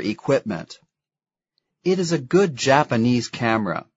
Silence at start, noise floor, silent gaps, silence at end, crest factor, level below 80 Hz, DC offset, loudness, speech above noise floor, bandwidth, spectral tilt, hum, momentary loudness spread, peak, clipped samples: 0 s; under -90 dBFS; none; 0.15 s; 22 dB; -60 dBFS; under 0.1%; -21 LUFS; over 69 dB; 8 kHz; -5.5 dB/octave; none; 11 LU; 0 dBFS; under 0.1%